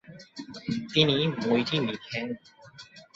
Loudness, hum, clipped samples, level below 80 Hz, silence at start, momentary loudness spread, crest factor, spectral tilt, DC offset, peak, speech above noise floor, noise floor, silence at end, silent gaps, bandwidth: -27 LUFS; none; under 0.1%; -64 dBFS; 0.1 s; 23 LU; 24 dB; -6 dB/octave; under 0.1%; -6 dBFS; 23 dB; -50 dBFS; 0.1 s; none; 7.8 kHz